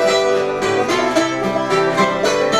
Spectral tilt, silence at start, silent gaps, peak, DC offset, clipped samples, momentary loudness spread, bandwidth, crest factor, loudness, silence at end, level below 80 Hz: -4 dB/octave; 0 s; none; 0 dBFS; under 0.1%; under 0.1%; 3 LU; 14 kHz; 16 dB; -16 LUFS; 0 s; -48 dBFS